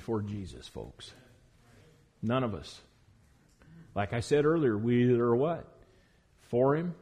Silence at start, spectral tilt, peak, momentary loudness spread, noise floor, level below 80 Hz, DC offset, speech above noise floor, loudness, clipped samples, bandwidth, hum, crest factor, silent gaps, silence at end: 0 s; -7.5 dB/octave; -16 dBFS; 20 LU; -64 dBFS; -60 dBFS; under 0.1%; 35 dB; -30 LUFS; under 0.1%; 11 kHz; none; 16 dB; none; 0.05 s